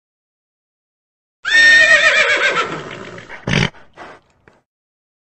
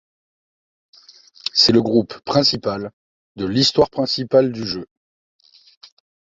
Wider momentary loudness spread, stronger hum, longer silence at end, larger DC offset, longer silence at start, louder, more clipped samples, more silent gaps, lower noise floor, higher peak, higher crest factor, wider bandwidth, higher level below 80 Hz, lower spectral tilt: first, 23 LU vs 15 LU; neither; second, 1.1 s vs 1.45 s; neither; about the same, 1.45 s vs 1.55 s; first, -11 LUFS vs -18 LUFS; neither; second, none vs 2.93-3.35 s; first, -53 dBFS vs -48 dBFS; about the same, 0 dBFS vs -2 dBFS; about the same, 16 dB vs 20 dB; first, 9 kHz vs 7.8 kHz; first, -46 dBFS vs -54 dBFS; second, -2.5 dB/octave vs -5 dB/octave